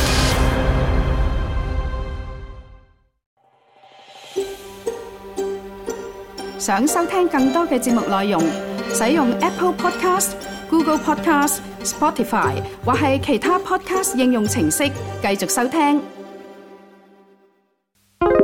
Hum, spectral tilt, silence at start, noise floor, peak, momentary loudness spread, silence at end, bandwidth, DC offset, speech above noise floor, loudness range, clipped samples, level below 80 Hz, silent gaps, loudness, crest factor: none; -4.5 dB/octave; 0 s; -64 dBFS; -2 dBFS; 14 LU; 0 s; 17 kHz; under 0.1%; 46 dB; 12 LU; under 0.1%; -30 dBFS; 3.26-3.37 s; -20 LUFS; 18 dB